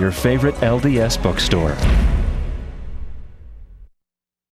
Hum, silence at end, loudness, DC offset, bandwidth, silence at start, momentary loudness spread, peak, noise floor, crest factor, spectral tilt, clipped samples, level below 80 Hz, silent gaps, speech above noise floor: none; 0.65 s; -18 LUFS; under 0.1%; 15.5 kHz; 0 s; 18 LU; -2 dBFS; -84 dBFS; 18 dB; -5.5 dB/octave; under 0.1%; -24 dBFS; none; 68 dB